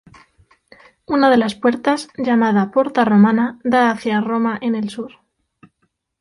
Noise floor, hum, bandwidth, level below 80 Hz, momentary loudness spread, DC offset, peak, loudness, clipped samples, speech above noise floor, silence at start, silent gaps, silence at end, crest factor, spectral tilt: -69 dBFS; none; 11.5 kHz; -58 dBFS; 9 LU; under 0.1%; -2 dBFS; -17 LUFS; under 0.1%; 52 dB; 1.1 s; none; 1.1 s; 16 dB; -6.5 dB/octave